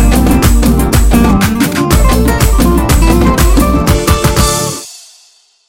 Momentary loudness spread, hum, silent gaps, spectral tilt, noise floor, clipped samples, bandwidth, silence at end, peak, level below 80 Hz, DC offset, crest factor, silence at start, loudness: 3 LU; none; none; -5 dB/octave; -47 dBFS; 0.5%; 17 kHz; 0.7 s; 0 dBFS; -12 dBFS; 0.7%; 8 dB; 0 s; -9 LUFS